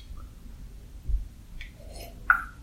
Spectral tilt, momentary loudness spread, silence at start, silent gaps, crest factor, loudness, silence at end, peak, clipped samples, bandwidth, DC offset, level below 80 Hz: -4.5 dB/octave; 23 LU; 0 s; none; 28 dB; -28 LUFS; 0 s; -4 dBFS; under 0.1%; 16 kHz; under 0.1%; -38 dBFS